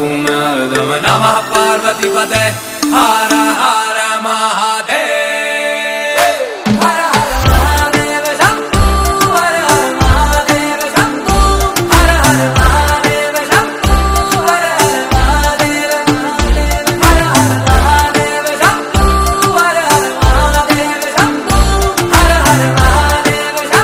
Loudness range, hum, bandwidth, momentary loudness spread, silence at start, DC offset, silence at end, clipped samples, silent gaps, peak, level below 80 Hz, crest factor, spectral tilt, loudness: 2 LU; none; 16.5 kHz; 4 LU; 0 s; under 0.1%; 0 s; 0.2%; none; 0 dBFS; -18 dBFS; 10 dB; -4 dB/octave; -11 LUFS